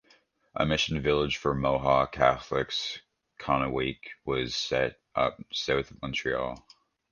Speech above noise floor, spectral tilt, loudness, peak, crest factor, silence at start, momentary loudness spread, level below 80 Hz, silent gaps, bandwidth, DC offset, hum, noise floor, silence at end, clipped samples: 36 dB; -4.5 dB/octave; -28 LUFS; -6 dBFS; 24 dB; 0.55 s; 11 LU; -48 dBFS; none; 9.8 kHz; under 0.1%; none; -64 dBFS; 0.55 s; under 0.1%